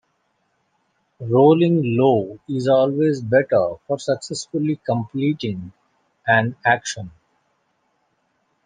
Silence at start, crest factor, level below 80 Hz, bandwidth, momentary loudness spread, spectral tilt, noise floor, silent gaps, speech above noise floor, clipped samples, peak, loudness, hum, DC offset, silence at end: 1.2 s; 20 dB; -64 dBFS; 10 kHz; 14 LU; -6 dB/octave; -68 dBFS; none; 50 dB; under 0.1%; -2 dBFS; -19 LUFS; none; under 0.1%; 1.55 s